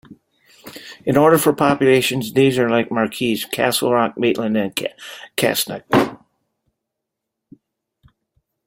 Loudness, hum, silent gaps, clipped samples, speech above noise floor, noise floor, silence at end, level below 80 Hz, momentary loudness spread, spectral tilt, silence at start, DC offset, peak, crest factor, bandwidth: -18 LUFS; none; none; under 0.1%; 63 dB; -81 dBFS; 2.5 s; -56 dBFS; 13 LU; -4.5 dB/octave; 0.65 s; under 0.1%; -2 dBFS; 18 dB; 16.5 kHz